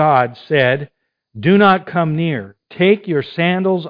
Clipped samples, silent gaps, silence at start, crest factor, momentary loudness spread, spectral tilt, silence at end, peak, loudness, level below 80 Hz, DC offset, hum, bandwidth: under 0.1%; none; 0 s; 16 dB; 10 LU; -9.5 dB/octave; 0 s; 0 dBFS; -16 LUFS; -60 dBFS; under 0.1%; none; 5.2 kHz